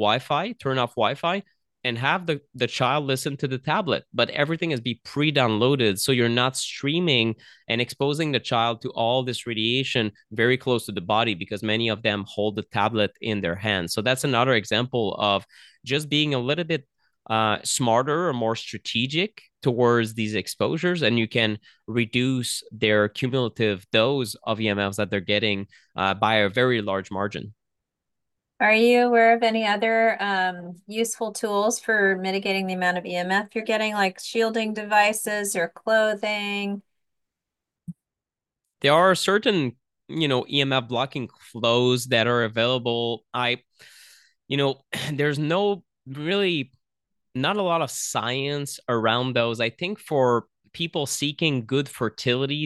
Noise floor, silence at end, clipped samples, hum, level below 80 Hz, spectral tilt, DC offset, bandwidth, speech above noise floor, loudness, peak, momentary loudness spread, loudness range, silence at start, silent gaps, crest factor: -89 dBFS; 0 s; under 0.1%; none; -66 dBFS; -4.5 dB/octave; under 0.1%; 12.5 kHz; 65 dB; -23 LUFS; -4 dBFS; 8 LU; 4 LU; 0 s; none; 20 dB